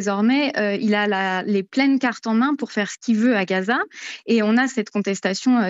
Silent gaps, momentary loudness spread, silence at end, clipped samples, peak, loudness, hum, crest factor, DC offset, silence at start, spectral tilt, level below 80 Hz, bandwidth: none; 5 LU; 0 s; under 0.1%; -6 dBFS; -20 LUFS; none; 14 dB; under 0.1%; 0 s; -5 dB/octave; -80 dBFS; 8 kHz